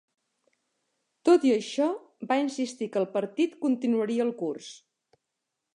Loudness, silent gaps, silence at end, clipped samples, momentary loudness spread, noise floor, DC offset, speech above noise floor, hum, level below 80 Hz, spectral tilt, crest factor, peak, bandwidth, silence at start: -27 LUFS; none; 1 s; under 0.1%; 12 LU; -84 dBFS; under 0.1%; 57 dB; none; -84 dBFS; -5 dB/octave; 18 dB; -10 dBFS; 11 kHz; 1.25 s